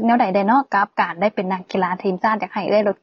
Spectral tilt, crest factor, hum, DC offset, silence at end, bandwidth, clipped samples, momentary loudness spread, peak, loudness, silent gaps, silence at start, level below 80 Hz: -7.5 dB/octave; 14 dB; none; under 0.1%; 0.1 s; 7.2 kHz; under 0.1%; 6 LU; -4 dBFS; -19 LUFS; none; 0 s; -68 dBFS